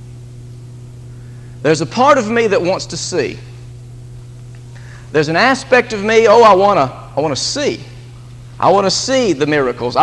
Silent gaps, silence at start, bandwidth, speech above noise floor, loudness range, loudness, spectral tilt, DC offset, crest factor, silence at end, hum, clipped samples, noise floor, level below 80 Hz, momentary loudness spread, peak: none; 0 s; 11.5 kHz; 21 dB; 5 LU; -13 LUFS; -4 dB/octave; under 0.1%; 14 dB; 0 s; none; under 0.1%; -34 dBFS; -44 dBFS; 24 LU; 0 dBFS